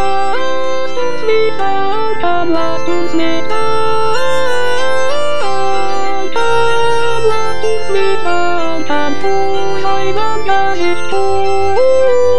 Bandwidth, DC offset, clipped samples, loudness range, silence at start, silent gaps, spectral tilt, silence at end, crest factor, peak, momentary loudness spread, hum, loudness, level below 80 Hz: 11 kHz; 40%; under 0.1%; 1 LU; 0 s; none; -4.5 dB/octave; 0 s; 12 dB; 0 dBFS; 4 LU; none; -15 LUFS; -42 dBFS